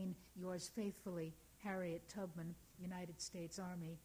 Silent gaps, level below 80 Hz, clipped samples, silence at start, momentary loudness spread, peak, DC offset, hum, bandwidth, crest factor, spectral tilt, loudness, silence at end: none; -72 dBFS; under 0.1%; 0 s; 6 LU; -32 dBFS; under 0.1%; none; over 20 kHz; 16 dB; -5 dB/octave; -49 LUFS; 0 s